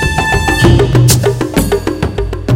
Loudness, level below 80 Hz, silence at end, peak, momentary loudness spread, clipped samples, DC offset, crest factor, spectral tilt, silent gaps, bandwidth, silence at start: -11 LUFS; -20 dBFS; 0 s; 0 dBFS; 9 LU; 0.3%; under 0.1%; 10 dB; -5 dB/octave; none; 17 kHz; 0 s